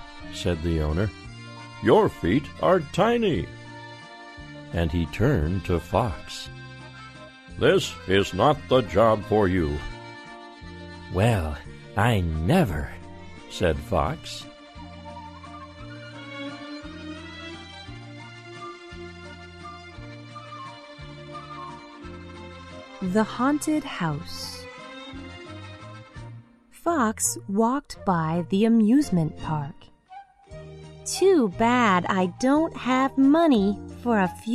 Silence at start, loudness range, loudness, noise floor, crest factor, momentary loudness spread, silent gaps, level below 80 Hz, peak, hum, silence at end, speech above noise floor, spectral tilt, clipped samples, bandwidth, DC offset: 0 s; 17 LU; -24 LUFS; -48 dBFS; 20 dB; 21 LU; none; -42 dBFS; -6 dBFS; none; 0 s; 26 dB; -5.5 dB/octave; under 0.1%; 14 kHz; under 0.1%